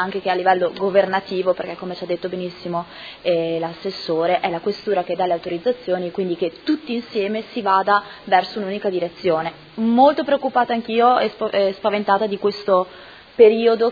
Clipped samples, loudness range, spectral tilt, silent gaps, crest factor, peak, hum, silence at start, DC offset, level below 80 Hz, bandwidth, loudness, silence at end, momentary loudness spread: under 0.1%; 5 LU; -7 dB/octave; none; 18 dB; 0 dBFS; none; 0 s; under 0.1%; -62 dBFS; 5 kHz; -20 LUFS; 0 s; 11 LU